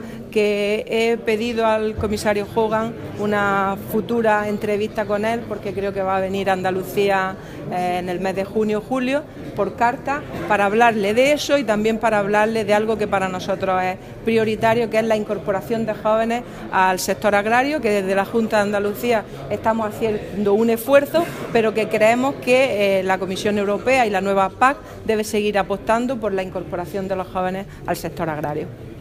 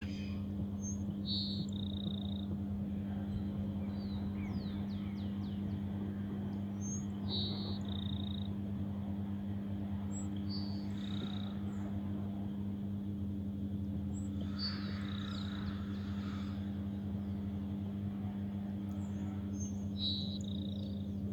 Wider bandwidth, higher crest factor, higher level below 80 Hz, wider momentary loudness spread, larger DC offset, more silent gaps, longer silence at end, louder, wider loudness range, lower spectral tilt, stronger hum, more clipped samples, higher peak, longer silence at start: first, 15.5 kHz vs 8.2 kHz; about the same, 18 dB vs 14 dB; first, -46 dBFS vs -58 dBFS; first, 9 LU vs 3 LU; neither; neither; about the same, 0 s vs 0 s; first, -20 LUFS vs -40 LUFS; first, 4 LU vs 1 LU; about the same, -5 dB/octave vs -6 dB/octave; neither; neither; first, -2 dBFS vs -26 dBFS; about the same, 0 s vs 0 s